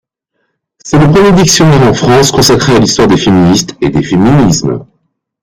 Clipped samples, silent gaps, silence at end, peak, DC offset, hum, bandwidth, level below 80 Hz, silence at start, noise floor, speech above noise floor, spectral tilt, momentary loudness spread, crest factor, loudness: 0.1%; none; 0.6 s; 0 dBFS; under 0.1%; none; 16.5 kHz; -30 dBFS; 0.85 s; -64 dBFS; 58 dB; -5 dB/octave; 7 LU; 8 dB; -7 LUFS